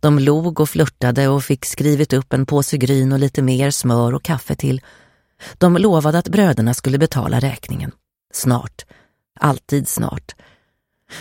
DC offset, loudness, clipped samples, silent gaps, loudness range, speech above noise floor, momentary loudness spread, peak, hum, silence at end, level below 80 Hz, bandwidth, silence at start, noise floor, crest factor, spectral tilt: under 0.1%; -17 LUFS; under 0.1%; none; 5 LU; 51 dB; 10 LU; 0 dBFS; none; 0 s; -46 dBFS; 17 kHz; 0.05 s; -67 dBFS; 16 dB; -6 dB/octave